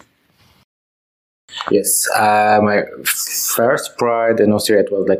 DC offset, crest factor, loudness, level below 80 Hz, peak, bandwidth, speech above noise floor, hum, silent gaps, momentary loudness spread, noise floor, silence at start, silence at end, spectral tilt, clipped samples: under 0.1%; 16 dB; -15 LUFS; -62 dBFS; -2 dBFS; 16 kHz; 40 dB; none; none; 6 LU; -55 dBFS; 1.5 s; 0 s; -3 dB/octave; under 0.1%